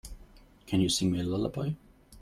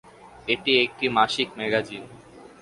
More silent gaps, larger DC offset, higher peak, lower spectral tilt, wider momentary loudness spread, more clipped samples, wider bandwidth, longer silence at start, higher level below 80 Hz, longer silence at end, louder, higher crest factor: neither; neither; second, -16 dBFS vs -4 dBFS; about the same, -5 dB/octave vs -4 dB/octave; second, 13 LU vs 16 LU; neither; first, 15 kHz vs 11.5 kHz; second, 0.05 s vs 0.25 s; first, -52 dBFS vs -60 dBFS; second, 0 s vs 0.15 s; second, -30 LUFS vs -23 LUFS; second, 16 dB vs 22 dB